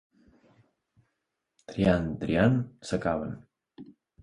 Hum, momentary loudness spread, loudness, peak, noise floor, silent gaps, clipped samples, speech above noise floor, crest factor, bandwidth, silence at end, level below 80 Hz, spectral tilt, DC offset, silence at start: none; 15 LU; -28 LUFS; -8 dBFS; -82 dBFS; none; under 0.1%; 56 dB; 22 dB; 11 kHz; 0.3 s; -50 dBFS; -7.5 dB/octave; under 0.1%; 1.7 s